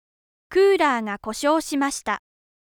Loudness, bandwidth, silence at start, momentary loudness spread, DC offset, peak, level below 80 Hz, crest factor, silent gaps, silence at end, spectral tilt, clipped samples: -22 LUFS; 18 kHz; 0.5 s; 11 LU; under 0.1%; -8 dBFS; -58 dBFS; 14 dB; none; 0.5 s; -3 dB/octave; under 0.1%